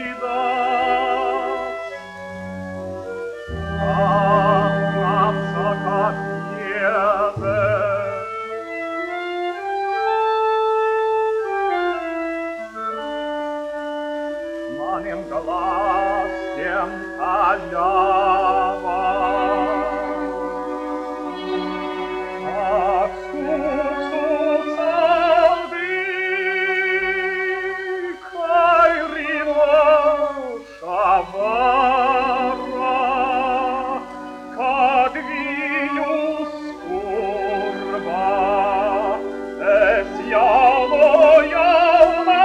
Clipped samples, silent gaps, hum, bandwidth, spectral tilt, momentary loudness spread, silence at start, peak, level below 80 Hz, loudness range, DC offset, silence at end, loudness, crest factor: under 0.1%; none; none; 9.8 kHz; -6.5 dB/octave; 13 LU; 0 s; 0 dBFS; -48 dBFS; 6 LU; under 0.1%; 0 s; -19 LUFS; 18 dB